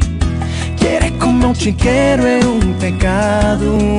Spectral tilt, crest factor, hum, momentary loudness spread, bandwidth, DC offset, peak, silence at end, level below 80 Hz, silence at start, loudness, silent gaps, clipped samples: -6 dB/octave; 10 dB; none; 5 LU; 11 kHz; under 0.1%; -2 dBFS; 0 s; -22 dBFS; 0 s; -14 LUFS; none; under 0.1%